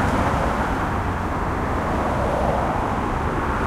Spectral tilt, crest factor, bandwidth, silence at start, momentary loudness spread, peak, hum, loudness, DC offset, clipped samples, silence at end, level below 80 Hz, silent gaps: -6.5 dB/octave; 12 dB; 15 kHz; 0 s; 3 LU; -8 dBFS; none; -23 LUFS; under 0.1%; under 0.1%; 0 s; -30 dBFS; none